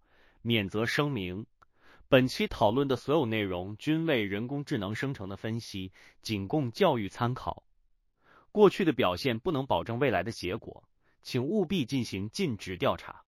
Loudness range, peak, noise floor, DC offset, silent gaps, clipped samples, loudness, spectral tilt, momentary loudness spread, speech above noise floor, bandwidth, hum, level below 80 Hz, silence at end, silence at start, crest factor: 4 LU; -8 dBFS; -70 dBFS; under 0.1%; none; under 0.1%; -30 LUFS; -6 dB/octave; 14 LU; 40 dB; 15.5 kHz; none; -58 dBFS; 0.1 s; 0.45 s; 22 dB